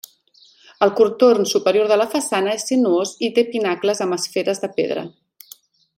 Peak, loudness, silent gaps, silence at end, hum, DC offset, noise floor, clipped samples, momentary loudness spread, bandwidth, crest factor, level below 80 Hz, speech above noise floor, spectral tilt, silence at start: -2 dBFS; -18 LUFS; none; 0.9 s; none; under 0.1%; -54 dBFS; under 0.1%; 8 LU; 16.5 kHz; 18 dB; -70 dBFS; 36 dB; -3.5 dB/octave; 0.8 s